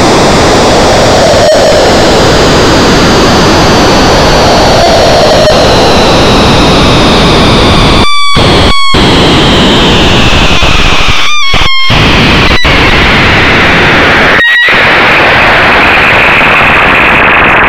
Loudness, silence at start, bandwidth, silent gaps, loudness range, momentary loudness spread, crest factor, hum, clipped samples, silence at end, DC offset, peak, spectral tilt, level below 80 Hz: -3 LUFS; 0 s; over 20 kHz; none; 2 LU; 3 LU; 4 dB; none; 10%; 0 s; under 0.1%; 0 dBFS; -4 dB/octave; -16 dBFS